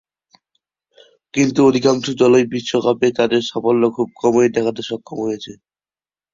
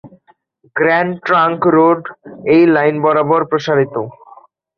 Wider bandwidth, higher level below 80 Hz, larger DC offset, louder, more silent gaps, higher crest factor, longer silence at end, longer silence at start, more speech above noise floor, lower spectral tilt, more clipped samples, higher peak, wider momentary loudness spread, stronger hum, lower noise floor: first, 7.6 kHz vs 6.4 kHz; about the same, -58 dBFS vs -58 dBFS; neither; second, -17 LUFS vs -13 LUFS; neither; about the same, 16 dB vs 12 dB; first, 0.8 s vs 0.65 s; first, 1.35 s vs 0.05 s; first, over 74 dB vs 40 dB; second, -5.5 dB/octave vs -7.5 dB/octave; neither; about the same, -2 dBFS vs -2 dBFS; second, 11 LU vs 14 LU; neither; first, under -90 dBFS vs -54 dBFS